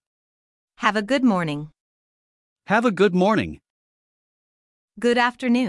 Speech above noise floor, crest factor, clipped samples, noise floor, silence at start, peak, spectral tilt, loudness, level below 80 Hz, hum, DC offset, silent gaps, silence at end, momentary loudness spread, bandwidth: over 70 dB; 20 dB; under 0.1%; under -90 dBFS; 0.8 s; -4 dBFS; -6 dB/octave; -21 LUFS; -60 dBFS; none; under 0.1%; 1.80-2.56 s, 3.70-4.88 s; 0 s; 11 LU; 12 kHz